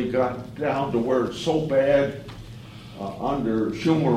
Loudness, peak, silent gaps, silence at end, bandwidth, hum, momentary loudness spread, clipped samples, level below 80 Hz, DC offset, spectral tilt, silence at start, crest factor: -24 LUFS; -8 dBFS; none; 0 s; 14 kHz; none; 19 LU; under 0.1%; -50 dBFS; under 0.1%; -7 dB/octave; 0 s; 16 dB